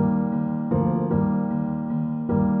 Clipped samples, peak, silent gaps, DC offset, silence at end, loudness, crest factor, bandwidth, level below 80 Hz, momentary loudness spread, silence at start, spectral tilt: under 0.1%; -10 dBFS; none; under 0.1%; 0 s; -24 LUFS; 14 dB; 2.7 kHz; -46 dBFS; 4 LU; 0 s; -12 dB/octave